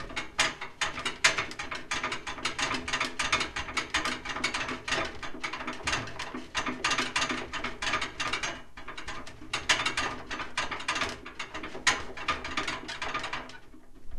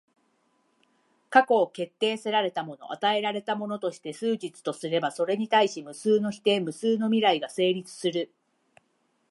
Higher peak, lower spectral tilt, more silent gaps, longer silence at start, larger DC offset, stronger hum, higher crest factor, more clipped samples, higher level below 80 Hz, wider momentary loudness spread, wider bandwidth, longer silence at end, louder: about the same, -6 dBFS vs -4 dBFS; second, -1.5 dB/octave vs -4.5 dB/octave; neither; second, 0 s vs 1.3 s; neither; neither; about the same, 26 dB vs 24 dB; neither; first, -50 dBFS vs -80 dBFS; first, 12 LU vs 9 LU; first, 13 kHz vs 11.5 kHz; second, 0 s vs 1.05 s; second, -31 LUFS vs -26 LUFS